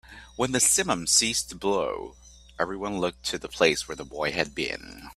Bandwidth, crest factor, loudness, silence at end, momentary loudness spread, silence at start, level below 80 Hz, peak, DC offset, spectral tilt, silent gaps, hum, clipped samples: 15.5 kHz; 24 dB; -25 LUFS; 0.05 s; 14 LU; 0.05 s; -52 dBFS; -4 dBFS; under 0.1%; -2 dB/octave; none; none; under 0.1%